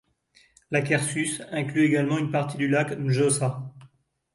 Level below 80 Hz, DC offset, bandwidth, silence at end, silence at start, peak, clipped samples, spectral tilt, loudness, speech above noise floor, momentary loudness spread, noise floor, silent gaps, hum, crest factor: -64 dBFS; under 0.1%; 11.5 kHz; 0.5 s; 0.7 s; -8 dBFS; under 0.1%; -5.5 dB/octave; -25 LUFS; 37 dB; 7 LU; -62 dBFS; none; none; 18 dB